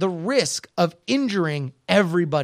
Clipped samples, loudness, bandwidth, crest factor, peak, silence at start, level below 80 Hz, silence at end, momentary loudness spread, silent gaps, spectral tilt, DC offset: under 0.1%; -22 LUFS; 15 kHz; 20 dB; -2 dBFS; 0 s; -68 dBFS; 0 s; 6 LU; none; -5 dB/octave; under 0.1%